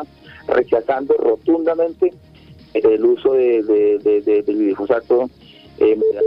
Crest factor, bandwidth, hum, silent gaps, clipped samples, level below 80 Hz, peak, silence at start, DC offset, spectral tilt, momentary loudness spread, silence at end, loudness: 14 dB; 5.4 kHz; none; none; under 0.1%; -54 dBFS; -4 dBFS; 0 s; under 0.1%; -8.5 dB/octave; 6 LU; 0 s; -17 LUFS